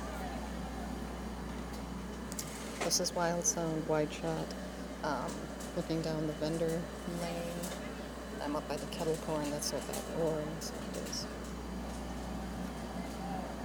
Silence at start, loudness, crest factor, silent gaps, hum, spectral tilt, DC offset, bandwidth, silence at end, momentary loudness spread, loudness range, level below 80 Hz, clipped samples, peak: 0 s; -37 LUFS; 20 dB; none; none; -4 dB/octave; under 0.1%; over 20 kHz; 0 s; 10 LU; 4 LU; -50 dBFS; under 0.1%; -18 dBFS